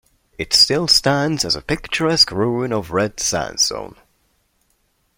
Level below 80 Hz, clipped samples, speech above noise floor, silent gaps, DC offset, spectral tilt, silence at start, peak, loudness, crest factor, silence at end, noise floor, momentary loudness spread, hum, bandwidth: -46 dBFS; under 0.1%; 46 dB; none; under 0.1%; -3 dB/octave; 0.4 s; 0 dBFS; -16 LUFS; 20 dB; 1.25 s; -64 dBFS; 9 LU; none; 16.5 kHz